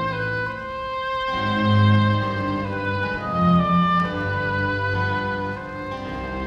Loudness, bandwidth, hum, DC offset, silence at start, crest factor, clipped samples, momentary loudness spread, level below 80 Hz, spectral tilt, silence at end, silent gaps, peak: -22 LUFS; 7 kHz; none; under 0.1%; 0 s; 16 dB; under 0.1%; 12 LU; -44 dBFS; -8 dB/octave; 0 s; none; -6 dBFS